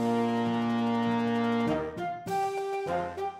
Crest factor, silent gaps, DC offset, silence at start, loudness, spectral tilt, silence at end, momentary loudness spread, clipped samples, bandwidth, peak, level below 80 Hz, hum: 12 dB; none; under 0.1%; 0 s; -29 LUFS; -6.5 dB/octave; 0 s; 5 LU; under 0.1%; 14.5 kHz; -16 dBFS; -60 dBFS; none